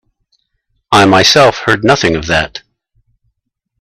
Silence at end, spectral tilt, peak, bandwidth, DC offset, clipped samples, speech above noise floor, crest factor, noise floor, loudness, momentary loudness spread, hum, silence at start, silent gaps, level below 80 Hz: 1.2 s; -4 dB/octave; 0 dBFS; 15.5 kHz; under 0.1%; under 0.1%; 62 dB; 12 dB; -71 dBFS; -9 LUFS; 9 LU; none; 0.9 s; none; -40 dBFS